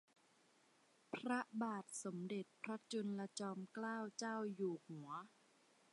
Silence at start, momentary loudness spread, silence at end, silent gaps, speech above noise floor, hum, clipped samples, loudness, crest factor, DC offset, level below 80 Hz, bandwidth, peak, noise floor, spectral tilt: 1.1 s; 8 LU; 0.65 s; none; 29 dB; none; under 0.1%; -47 LUFS; 20 dB; under 0.1%; under -90 dBFS; 11.5 kHz; -28 dBFS; -75 dBFS; -4.5 dB/octave